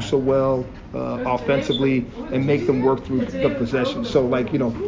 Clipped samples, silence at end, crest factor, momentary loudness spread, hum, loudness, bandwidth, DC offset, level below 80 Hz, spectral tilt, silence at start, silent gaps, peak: under 0.1%; 0 s; 16 dB; 6 LU; none; -21 LUFS; 7.6 kHz; under 0.1%; -42 dBFS; -7 dB/octave; 0 s; none; -6 dBFS